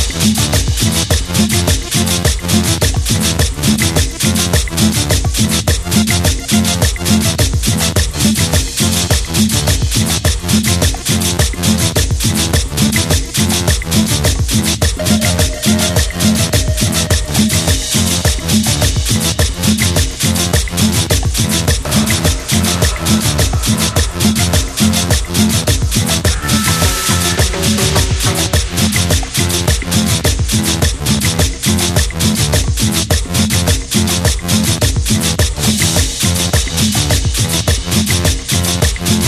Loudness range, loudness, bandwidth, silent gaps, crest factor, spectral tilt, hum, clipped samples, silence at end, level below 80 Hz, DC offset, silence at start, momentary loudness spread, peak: 1 LU; -13 LUFS; 14.5 kHz; none; 12 dB; -3.5 dB/octave; none; under 0.1%; 0 s; -22 dBFS; under 0.1%; 0 s; 2 LU; 0 dBFS